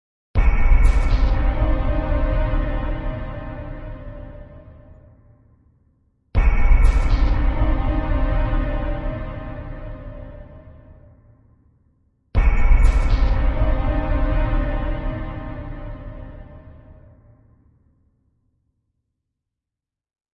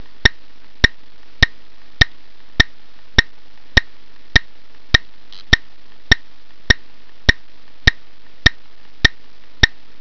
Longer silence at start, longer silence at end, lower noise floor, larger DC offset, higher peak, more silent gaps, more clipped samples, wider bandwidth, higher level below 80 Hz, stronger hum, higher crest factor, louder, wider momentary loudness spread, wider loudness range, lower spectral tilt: about the same, 0.35 s vs 0.25 s; first, 3.4 s vs 0.35 s; first, -87 dBFS vs -51 dBFS; second, under 0.1% vs 6%; about the same, -2 dBFS vs 0 dBFS; neither; second, under 0.1% vs 0.1%; about the same, 5.6 kHz vs 5.4 kHz; first, -20 dBFS vs -26 dBFS; neither; about the same, 18 dB vs 20 dB; second, -23 LUFS vs -17 LUFS; first, 20 LU vs 1 LU; first, 14 LU vs 1 LU; first, -8 dB/octave vs -3.5 dB/octave